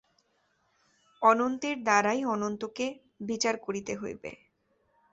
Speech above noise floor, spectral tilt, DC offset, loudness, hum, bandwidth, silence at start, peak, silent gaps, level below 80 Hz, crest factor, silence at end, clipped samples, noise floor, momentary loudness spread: 44 dB; -3.5 dB/octave; under 0.1%; -29 LUFS; none; 8.2 kHz; 1.2 s; -8 dBFS; none; -70 dBFS; 22 dB; 0.8 s; under 0.1%; -72 dBFS; 14 LU